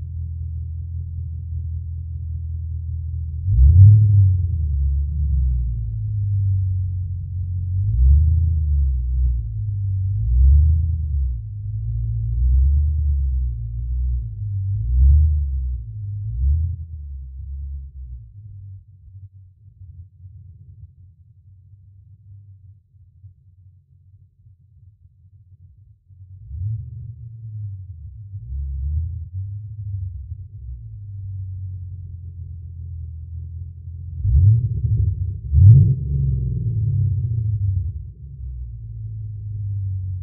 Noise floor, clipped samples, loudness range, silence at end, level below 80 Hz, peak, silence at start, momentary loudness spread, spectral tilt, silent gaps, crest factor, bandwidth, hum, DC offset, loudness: -51 dBFS; under 0.1%; 17 LU; 0 s; -24 dBFS; 0 dBFS; 0 s; 20 LU; -19.5 dB/octave; none; 20 dB; 0.5 kHz; none; under 0.1%; -21 LUFS